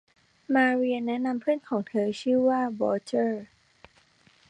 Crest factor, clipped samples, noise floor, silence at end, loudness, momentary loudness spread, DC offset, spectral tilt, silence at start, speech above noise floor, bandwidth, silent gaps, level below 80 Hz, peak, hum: 16 dB; under 0.1%; -61 dBFS; 1.05 s; -26 LUFS; 6 LU; under 0.1%; -6 dB/octave; 0.5 s; 36 dB; 9.6 kHz; none; -72 dBFS; -10 dBFS; none